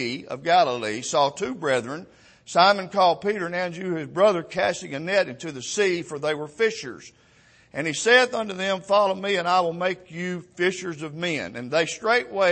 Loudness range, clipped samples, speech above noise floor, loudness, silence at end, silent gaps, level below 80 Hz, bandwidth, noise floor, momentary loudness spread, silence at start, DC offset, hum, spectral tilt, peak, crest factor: 3 LU; under 0.1%; 33 dB; -23 LUFS; 0 s; none; -66 dBFS; 8.8 kHz; -56 dBFS; 12 LU; 0 s; under 0.1%; none; -3.5 dB/octave; -4 dBFS; 20 dB